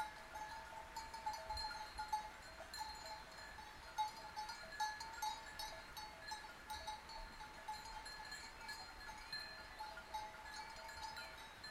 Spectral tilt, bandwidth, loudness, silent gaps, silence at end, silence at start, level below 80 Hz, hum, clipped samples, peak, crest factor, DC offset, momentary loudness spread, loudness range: -1.5 dB/octave; 16 kHz; -50 LUFS; none; 0 s; 0 s; -64 dBFS; none; under 0.1%; -30 dBFS; 20 dB; under 0.1%; 7 LU; 3 LU